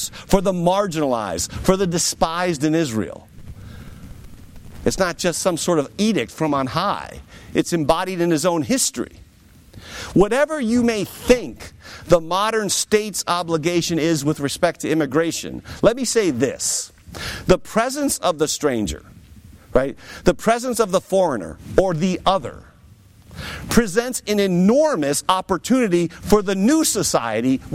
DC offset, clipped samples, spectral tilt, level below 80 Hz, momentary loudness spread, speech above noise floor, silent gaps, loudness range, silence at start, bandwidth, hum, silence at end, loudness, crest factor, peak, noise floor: under 0.1%; under 0.1%; -4.5 dB/octave; -40 dBFS; 13 LU; 29 dB; none; 4 LU; 0 s; 16.5 kHz; none; 0 s; -20 LUFS; 18 dB; -2 dBFS; -48 dBFS